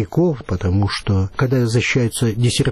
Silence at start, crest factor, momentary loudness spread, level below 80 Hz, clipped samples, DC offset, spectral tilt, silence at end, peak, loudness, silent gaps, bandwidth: 0 s; 10 dB; 3 LU; -38 dBFS; under 0.1%; under 0.1%; -5.5 dB/octave; 0 s; -6 dBFS; -18 LUFS; none; 13.5 kHz